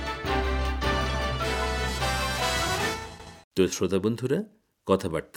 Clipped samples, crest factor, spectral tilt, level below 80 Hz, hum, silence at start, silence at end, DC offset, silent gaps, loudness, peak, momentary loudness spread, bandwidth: under 0.1%; 20 dB; -4.5 dB/octave; -36 dBFS; none; 0 s; 0.1 s; under 0.1%; 3.44-3.51 s; -27 LUFS; -8 dBFS; 9 LU; 18 kHz